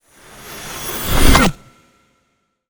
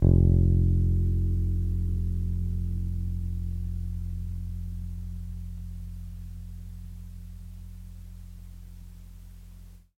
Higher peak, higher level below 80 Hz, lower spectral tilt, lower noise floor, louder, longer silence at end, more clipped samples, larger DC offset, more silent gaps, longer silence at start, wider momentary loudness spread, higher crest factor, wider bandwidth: first, 0 dBFS vs -6 dBFS; first, -22 dBFS vs -32 dBFS; second, -4 dB/octave vs -10.5 dB/octave; first, -66 dBFS vs -47 dBFS; first, -15 LUFS vs -29 LUFS; first, 1.15 s vs 0.2 s; neither; neither; neither; first, 0.45 s vs 0 s; about the same, 21 LU vs 23 LU; second, 16 dB vs 22 dB; first, over 20 kHz vs 1.3 kHz